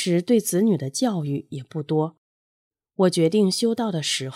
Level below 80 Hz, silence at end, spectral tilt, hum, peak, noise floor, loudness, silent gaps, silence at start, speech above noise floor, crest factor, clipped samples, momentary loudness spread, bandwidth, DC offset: -74 dBFS; 0 s; -5 dB/octave; none; -8 dBFS; under -90 dBFS; -22 LUFS; 2.18-2.71 s; 0 s; over 68 dB; 16 dB; under 0.1%; 11 LU; 15.5 kHz; under 0.1%